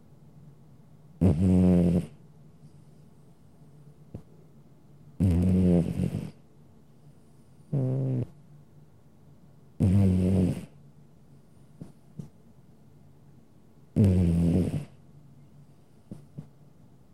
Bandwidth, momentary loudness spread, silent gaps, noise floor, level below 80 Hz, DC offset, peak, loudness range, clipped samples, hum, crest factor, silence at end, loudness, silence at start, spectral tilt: 12 kHz; 25 LU; none; -57 dBFS; -48 dBFS; 0.2%; -12 dBFS; 8 LU; under 0.1%; none; 18 dB; 0.7 s; -26 LUFS; 1.2 s; -9.5 dB/octave